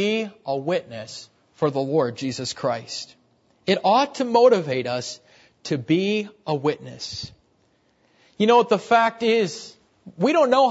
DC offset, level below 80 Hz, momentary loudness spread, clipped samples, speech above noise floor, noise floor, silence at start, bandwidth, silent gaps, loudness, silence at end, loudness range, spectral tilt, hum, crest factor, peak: under 0.1%; -66 dBFS; 18 LU; under 0.1%; 42 dB; -64 dBFS; 0 s; 8 kHz; none; -22 LUFS; 0 s; 5 LU; -5 dB/octave; none; 18 dB; -4 dBFS